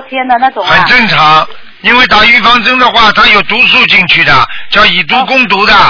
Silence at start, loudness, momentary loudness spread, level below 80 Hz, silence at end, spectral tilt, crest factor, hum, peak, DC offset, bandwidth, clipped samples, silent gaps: 0 s; -4 LUFS; 6 LU; -32 dBFS; 0 s; -4 dB/octave; 6 dB; none; 0 dBFS; under 0.1%; 5.4 kHz; 7%; none